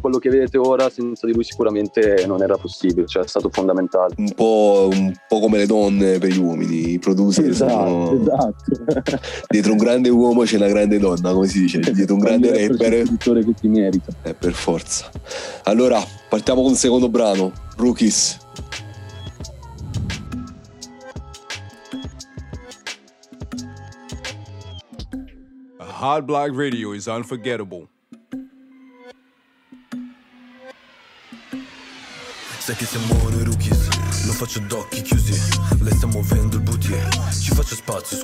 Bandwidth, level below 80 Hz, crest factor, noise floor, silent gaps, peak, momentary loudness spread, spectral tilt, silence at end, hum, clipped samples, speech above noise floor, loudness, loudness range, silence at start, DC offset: 16.5 kHz; -32 dBFS; 14 dB; -59 dBFS; none; -4 dBFS; 20 LU; -5.5 dB/octave; 0 s; none; under 0.1%; 41 dB; -18 LUFS; 18 LU; 0 s; under 0.1%